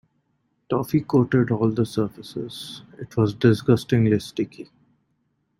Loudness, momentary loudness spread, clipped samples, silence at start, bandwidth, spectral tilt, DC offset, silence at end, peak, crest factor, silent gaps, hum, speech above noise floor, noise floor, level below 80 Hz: -22 LUFS; 15 LU; under 0.1%; 0.7 s; 16 kHz; -7.5 dB/octave; under 0.1%; 0.95 s; -4 dBFS; 18 dB; none; none; 49 dB; -71 dBFS; -56 dBFS